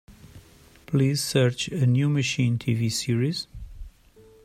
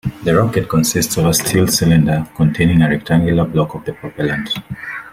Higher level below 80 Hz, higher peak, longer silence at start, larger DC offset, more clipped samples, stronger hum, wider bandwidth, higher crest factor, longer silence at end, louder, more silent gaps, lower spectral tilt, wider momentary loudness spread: second, -50 dBFS vs -38 dBFS; second, -6 dBFS vs -2 dBFS; about the same, 0.1 s vs 0.05 s; neither; neither; neither; second, 14.5 kHz vs 16.5 kHz; about the same, 18 dB vs 14 dB; first, 0.55 s vs 0.05 s; second, -24 LUFS vs -15 LUFS; neither; about the same, -5.5 dB/octave vs -5 dB/octave; about the same, 11 LU vs 10 LU